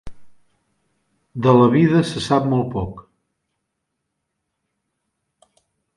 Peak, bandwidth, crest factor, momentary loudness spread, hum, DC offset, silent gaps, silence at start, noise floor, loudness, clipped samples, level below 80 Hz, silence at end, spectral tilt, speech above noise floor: 0 dBFS; 11.5 kHz; 20 dB; 15 LU; none; under 0.1%; none; 0.05 s; -77 dBFS; -17 LUFS; under 0.1%; -48 dBFS; 2.95 s; -7.5 dB/octave; 61 dB